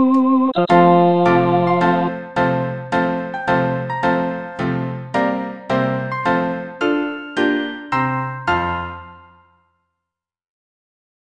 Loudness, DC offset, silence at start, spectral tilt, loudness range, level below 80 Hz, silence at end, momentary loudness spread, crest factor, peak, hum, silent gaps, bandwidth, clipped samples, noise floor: -18 LUFS; under 0.1%; 0 s; -8 dB/octave; 8 LU; -50 dBFS; 2.1 s; 10 LU; 18 dB; -2 dBFS; none; none; 9.2 kHz; under 0.1%; -85 dBFS